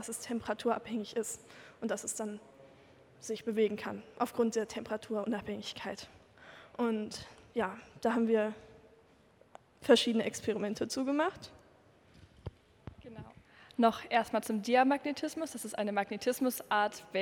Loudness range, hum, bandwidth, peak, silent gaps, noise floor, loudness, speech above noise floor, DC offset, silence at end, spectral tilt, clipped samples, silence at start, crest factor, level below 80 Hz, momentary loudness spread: 6 LU; none; 18 kHz; -14 dBFS; none; -64 dBFS; -34 LUFS; 30 dB; under 0.1%; 0 s; -4 dB/octave; under 0.1%; 0 s; 22 dB; -68 dBFS; 21 LU